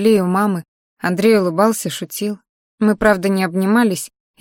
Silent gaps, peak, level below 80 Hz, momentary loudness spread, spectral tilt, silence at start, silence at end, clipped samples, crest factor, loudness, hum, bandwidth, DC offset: 0.68-0.97 s, 2.49-2.78 s; -2 dBFS; -48 dBFS; 11 LU; -5.5 dB/octave; 0 s; 0.35 s; under 0.1%; 16 dB; -17 LUFS; none; 17 kHz; under 0.1%